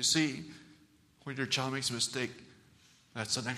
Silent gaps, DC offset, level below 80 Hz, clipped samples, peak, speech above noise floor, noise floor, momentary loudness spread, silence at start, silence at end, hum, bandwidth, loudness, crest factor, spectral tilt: none; under 0.1%; -72 dBFS; under 0.1%; -14 dBFS; 30 dB; -64 dBFS; 19 LU; 0 s; 0 s; none; 15 kHz; -33 LUFS; 22 dB; -2.5 dB/octave